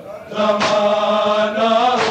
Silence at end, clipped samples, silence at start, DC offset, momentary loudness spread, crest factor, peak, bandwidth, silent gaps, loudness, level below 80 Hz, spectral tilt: 0 s; under 0.1%; 0 s; under 0.1%; 4 LU; 12 dB; -4 dBFS; 9.2 kHz; none; -16 LUFS; -58 dBFS; -4 dB/octave